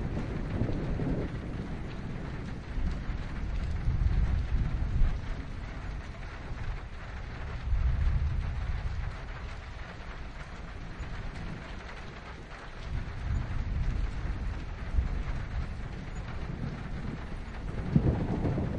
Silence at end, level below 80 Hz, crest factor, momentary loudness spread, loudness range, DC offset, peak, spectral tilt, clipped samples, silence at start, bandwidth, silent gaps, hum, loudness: 0 s; -34 dBFS; 22 dB; 12 LU; 7 LU; under 0.1%; -10 dBFS; -7.5 dB/octave; under 0.1%; 0 s; 8.6 kHz; none; none; -36 LUFS